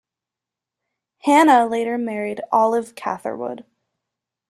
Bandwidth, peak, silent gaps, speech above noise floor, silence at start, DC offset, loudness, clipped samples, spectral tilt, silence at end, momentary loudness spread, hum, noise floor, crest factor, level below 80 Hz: 13.5 kHz; -2 dBFS; none; 68 dB; 1.25 s; under 0.1%; -19 LUFS; under 0.1%; -4.5 dB/octave; 0.9 s; 15 LU; none; -87 dBFS; 18 dB; -70 dBFS